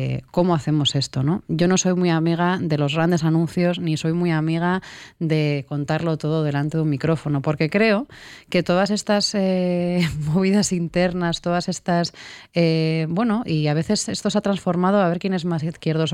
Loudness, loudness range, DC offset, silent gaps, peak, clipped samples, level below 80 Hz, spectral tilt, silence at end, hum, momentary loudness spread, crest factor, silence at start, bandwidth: -21 LUFS; 2 LU; under 0.1%; none; -6 dBFS; under 0.1%; -52 dBFS; -5.5 dB/octave; 0 s; none; 5 LU; 14 dB; 0 s; 12 kHz